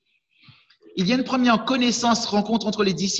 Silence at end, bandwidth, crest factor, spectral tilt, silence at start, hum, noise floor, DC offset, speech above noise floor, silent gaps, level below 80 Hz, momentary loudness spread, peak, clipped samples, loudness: 0 s; 8.2 kHz; 16 dB; -4 dB/octave; 0.95 s; none; -56 dBFS; under 0.1%; 35 dB; none; -60 dBFS; 4 LU; -6 dBFS; under 0.1%; -21 LUFS